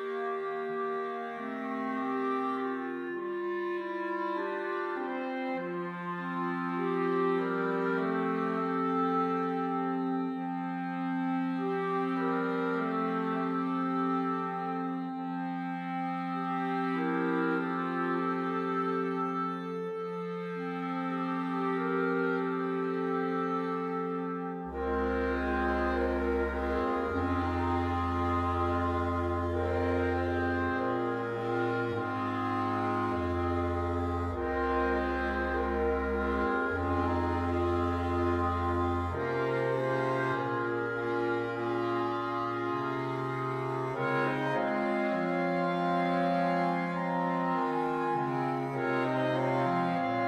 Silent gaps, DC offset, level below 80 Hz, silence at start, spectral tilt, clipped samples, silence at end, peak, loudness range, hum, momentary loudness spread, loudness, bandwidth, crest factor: none; under 0.1%; -48 dBFS; 0 s; -8 dB/octave; under 0.1%; 0 s; -16 dBFS; 3 LU; none; 5 LU; -31 LUFS; 8.8 kHz; 14 dB